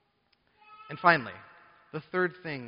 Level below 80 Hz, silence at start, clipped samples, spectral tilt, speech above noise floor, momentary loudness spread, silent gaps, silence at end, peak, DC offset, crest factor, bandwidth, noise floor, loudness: -72 dBFS; 0.7 s; under 0.1%; -3 dB/octave; 43 dB; 20 LU; none; 0 s; -4 dBFS; under 0.1%; 26 dB; 5.4 kHz; -71 dBFS; -27 LUFS